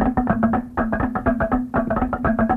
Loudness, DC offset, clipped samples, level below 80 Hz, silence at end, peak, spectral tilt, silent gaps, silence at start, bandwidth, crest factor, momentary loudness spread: -21 LUFS; under 0.1%; under 0.1%; -32 dBFS; 0 s; -4 dBFS; -10 dB/octave; none; 0 s; 3.8 kHz; 16 dB; 3 LU